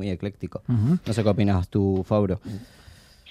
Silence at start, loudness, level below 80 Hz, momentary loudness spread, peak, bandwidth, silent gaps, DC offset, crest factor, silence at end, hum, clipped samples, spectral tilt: 0 s; -24 LUFS; -52 dBFS; 11 LU; -6 dBFS; 11 kHz; none; under 0.1%; 18 dB; 0 s; none; under 0.1%; -8.5 dB/octave